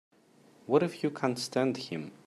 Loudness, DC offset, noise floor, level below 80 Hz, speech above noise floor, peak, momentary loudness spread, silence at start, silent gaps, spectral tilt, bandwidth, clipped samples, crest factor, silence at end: -31 LUFS; under 0.1%; -61 dBFS; -76 dBFS; 31 dB; -12 dBFS; 10 LU; 0.7 s; none; -5.5 dB/octave; 14.5 kHz; under 0.1%; 20 dB; 0.15 s